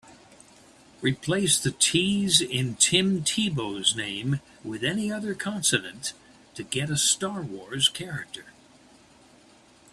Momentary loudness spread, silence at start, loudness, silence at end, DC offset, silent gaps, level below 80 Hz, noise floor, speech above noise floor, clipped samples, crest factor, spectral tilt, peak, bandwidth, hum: 14 LU; 0.05 s; -25 LUFS; 1.45 s; under 0.1%; none; -60 dBFS; -56 dBFS; 29 dB; under 0.1%; 24 dB; -2.5 dB/octave; -4 dBFS; 15.5 kHz; none